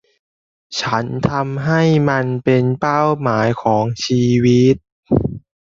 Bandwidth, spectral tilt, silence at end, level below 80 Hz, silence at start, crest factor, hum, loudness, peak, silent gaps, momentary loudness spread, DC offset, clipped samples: 7.6 kHz; -6.5 dB/octave; 0.3 s; -44 dBFS; 0.7 s; 14 dB; none; -16 LUFS; -2 dBFS; 4.92-5.03 s; 6 LU; under 0.1%; under 0.1%